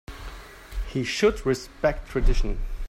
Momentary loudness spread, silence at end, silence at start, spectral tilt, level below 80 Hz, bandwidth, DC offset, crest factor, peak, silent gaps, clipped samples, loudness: 18 LU; 0 s; 0.1 s; -5 dB/octave; -28 dBFS; 13 kHz; under 0.1%; 16 dB; -8 dBFS; none; under 0.1%; -26 LUFS